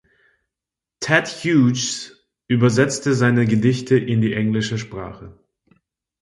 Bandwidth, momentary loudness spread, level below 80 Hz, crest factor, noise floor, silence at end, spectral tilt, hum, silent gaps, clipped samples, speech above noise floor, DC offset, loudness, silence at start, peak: 11.5 kHz; 13 LU; -54 dBFS; 20 dB; -87 dBFS; 0.9 s; -5.5 dB/octave; none; none; under 0.1%; 69 dB; under 0.1%; -19 LUFS; 1 s; 0 dBFS